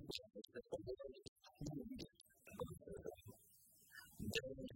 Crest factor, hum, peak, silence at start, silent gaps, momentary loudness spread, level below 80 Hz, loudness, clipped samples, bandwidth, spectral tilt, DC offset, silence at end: 26 dB; none; -26 dBFS; 0 s; 1.28-1.36 s; 17 LU; -70 dBFS; -52 LUFS; under 0.1%; 16.5 kHz; -4.5 dB/octave; under 0.1%; 0 s